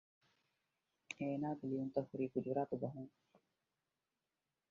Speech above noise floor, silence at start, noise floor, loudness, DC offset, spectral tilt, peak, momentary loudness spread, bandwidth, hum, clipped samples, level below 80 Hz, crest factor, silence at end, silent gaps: over 48 dB; 1.1 s; under -90 dBFS; -42 LUFS; under 0.1%; -7.5 dB/octave; -24 dBFS; 11 LU; 7.2 kHz; none; under 0.1%; -82 dBFS; 22 dB; 1.65 s; none